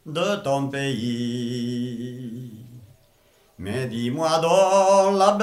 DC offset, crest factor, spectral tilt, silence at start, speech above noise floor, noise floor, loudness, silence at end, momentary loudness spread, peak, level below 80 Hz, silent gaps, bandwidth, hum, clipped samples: under 0.1%; 20 dB; -5 dB/octave; 0.05 s; 38 dB; -59 dBFS; -22 LUFS; 0 s; 18 LU; -4 dBFS; -64 dBFS; none; 15 kHz; none; under 0.1%